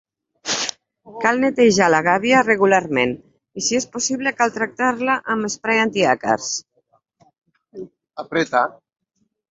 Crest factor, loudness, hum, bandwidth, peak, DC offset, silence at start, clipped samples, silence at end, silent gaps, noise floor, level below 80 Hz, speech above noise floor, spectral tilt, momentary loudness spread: 20 dB; -19 LUFS; none; 8 kHz; 0 dBFS; under 0.1%; 0.45 s; under 0.1%; 0.8 s; none; -63 dBFS; -60 dBFS; 45 dB; -3 dB/octave; 15 LU